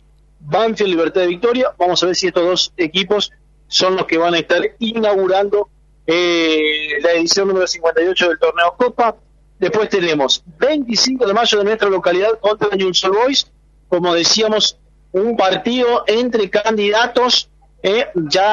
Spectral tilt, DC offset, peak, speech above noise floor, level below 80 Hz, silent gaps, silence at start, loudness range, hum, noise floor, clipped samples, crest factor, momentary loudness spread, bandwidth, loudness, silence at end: -3 dB/octave; under 0.1%; 0 dBFS; 24 dB; -50 dBFS; none; 0.45 s; 1 LU; none; -39 dBFS; under 0.1%; 14 dB; 5 LU; 11 kHz; -15 LUFS; 0 s